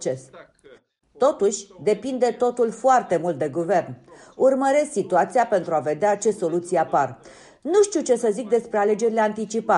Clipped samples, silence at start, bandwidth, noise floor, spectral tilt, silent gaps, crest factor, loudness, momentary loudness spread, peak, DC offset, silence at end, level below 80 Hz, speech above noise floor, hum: under 0.1%; 0 s; 11.5 kHz; -52 dBFS; -5 dB/octave; none; 14 dB; -22 LUFS; 6 LU; -8 dBFS; under 0.1%; 0 s; -66 dBFS; 31 dB; none